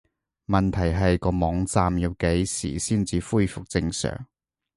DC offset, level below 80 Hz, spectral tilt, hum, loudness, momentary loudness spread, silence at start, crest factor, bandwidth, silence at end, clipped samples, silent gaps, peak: under 0.1%; -36 dBFS; -5.5 dB/octave; none; -24 LUFS; 5 LU; 0.5 s; 20 dB; 11.5 kHz; 0.5 s; under 0.1%; none; -6 dBFS